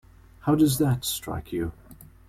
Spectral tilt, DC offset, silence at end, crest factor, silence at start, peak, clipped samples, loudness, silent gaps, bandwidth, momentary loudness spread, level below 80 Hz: -5.5 dB/octave; under 0.1%; 0.25 s; 16 dB; 0.45 s; -10 dBFS; under 0.1%; -26 LUFS; none; 16.5 kHz; 11 LU; -48 dBFS